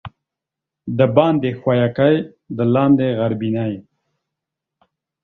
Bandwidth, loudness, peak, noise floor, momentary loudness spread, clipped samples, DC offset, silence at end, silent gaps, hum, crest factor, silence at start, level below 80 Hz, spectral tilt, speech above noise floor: 4.5 kHz; -17 LUFS; 0 dBFS; -85 dBFS; 12 LU; under 0.1%; under 0.1%; 1.4 s; none; none; 18 dB; 0.05 s; -56 dBFS; -10.5 dB/octave; 68 dB